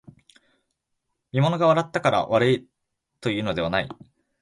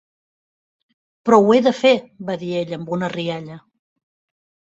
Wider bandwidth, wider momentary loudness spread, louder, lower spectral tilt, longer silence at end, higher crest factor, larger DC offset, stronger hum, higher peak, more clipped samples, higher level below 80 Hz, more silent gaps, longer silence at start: first, 11.5 kHz vs 8 kHz; second, 9 LU vs 14 LU; second, -23 LUFS vs -18 LUFS; about the same, -6.5 dB/octave vs -6 dB/octave; second, 0.5 s vs 1.2 s; about the same, 18 dB vs 18 dB; neither; neither; second, -6 dBFS vs -2 dBFS; neither; first, -56 dBFS vs -64 dBFS; neither; about the same, 1.35 s vs 1.25 s